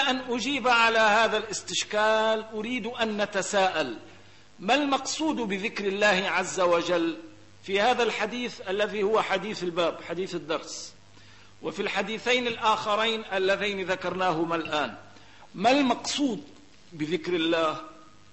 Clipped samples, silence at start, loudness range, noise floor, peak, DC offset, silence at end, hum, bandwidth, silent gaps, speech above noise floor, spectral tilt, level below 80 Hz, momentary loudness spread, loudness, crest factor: under 0.1%; 0 s; 5 LU; -53 dBFS; -10 dBFS; 0.2%; 0.3 s; none; 8.6 kHz; none; 27 dB; -3 dB/octave; -64 dBFS; 11 LU; -26 LUFS; 18 dB